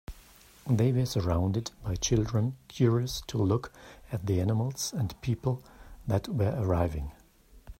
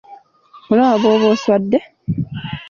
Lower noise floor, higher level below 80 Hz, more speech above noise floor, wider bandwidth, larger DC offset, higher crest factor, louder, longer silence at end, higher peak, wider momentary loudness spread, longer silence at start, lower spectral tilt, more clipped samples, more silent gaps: first, -57 dBFS vs -46 dBFS; about the same, -46 dBFS vs -48 dBFS; about the same, 28 dB vs 31 dB; first, 16 kHz vs 7.2 kHz; neither; about the same, 18 dB vs 14 dB; second, -30 LUFS vs -16 LUFS; about the same, 0.1 s vs 0.05 s; second, -12 dBFS vs -2 dBFS; about the same, 12 LU vs 11 LU; about the same, 0.1 s vs 0.1 s; about the same, -6 dB/octave vs -7 dB/octave; neither; neither